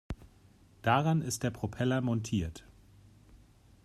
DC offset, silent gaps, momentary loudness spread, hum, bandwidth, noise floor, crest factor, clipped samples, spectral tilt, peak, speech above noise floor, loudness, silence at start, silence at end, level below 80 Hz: under 0.1%; none; 18 LU; none; 14 kHz; -61 dBFS; 22 dB; under 0.1%; -5.5 dB/octave; -12 dBFS; 30 dB; -32 LUFS; 0.1 s; 0.5 s; -54 dBFS